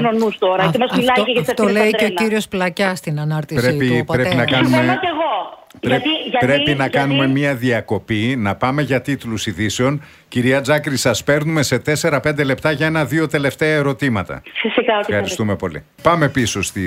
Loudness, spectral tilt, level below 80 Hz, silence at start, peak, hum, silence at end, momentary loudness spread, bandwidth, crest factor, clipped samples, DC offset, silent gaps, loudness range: -17 LUFS; -5 dB/octave; -48 dBFS; 0 s; 0 dBFS; none; 0 s; 6 LU; 16 kHz; 16 dB; under 0.1%; under 0.1%; none; 2 LU